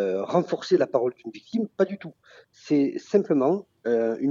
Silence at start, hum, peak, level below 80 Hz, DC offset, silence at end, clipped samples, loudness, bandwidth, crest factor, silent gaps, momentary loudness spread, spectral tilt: 0 s; none; -8 dBFS; -76 dBFS; under 0.1%; 0 s; under 0.1%; -25 LUFS; 7.4 kHz; 18 dB; none; 8 LU; -7 dB/octave